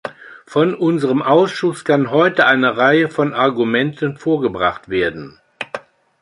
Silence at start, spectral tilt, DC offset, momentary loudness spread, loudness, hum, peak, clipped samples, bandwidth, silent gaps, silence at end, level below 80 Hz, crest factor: 0.05 s; -6.5 dB/octave; under 0.1%; 15 LU; -16 LUFS; none; 0 dBFS; under 0.1%; 11 kHz; none; 0.45 s; -54 dBFS; 16 dB